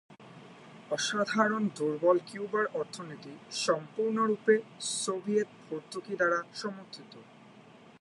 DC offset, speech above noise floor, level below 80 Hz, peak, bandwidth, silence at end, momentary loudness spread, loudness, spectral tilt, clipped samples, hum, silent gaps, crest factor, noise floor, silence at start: under 0.1%; 24 dB; -84 dBFS; -10 dBFS; 11.5 kHz; 0.4 s; 20 LU; -31 LUFS; -3.5 dB/octave; under 0.1%; none; none; 22 dB; -55 dBFS; 0.1 s